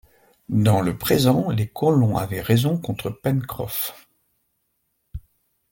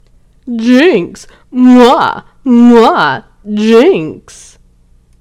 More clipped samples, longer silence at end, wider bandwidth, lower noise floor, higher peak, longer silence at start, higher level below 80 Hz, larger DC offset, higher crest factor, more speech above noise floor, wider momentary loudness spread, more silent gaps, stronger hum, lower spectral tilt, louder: second, under 0.1% vs 5%; second, 0.5 s vs 1 s; first, 17 kHz vs 10.5 kHz; first, -72 dBFS vs -46 dBFS; second, -4 dBFS vs 0 dBFS; about the same, 0.5 s vs 0.45 s; about the same, -48 dBFS vs -44 dBFS; neither; first, 18 dB vs 10 dB; first, 52 dB vs 38 dB; second, 11 LU vs 16 LU; neither; second, none vs 60 Hz at -50 dBFS; about the same, -6.5 dB/octave vs -5.5 dB/octave; second, -22 LUFS vs -8 LUFS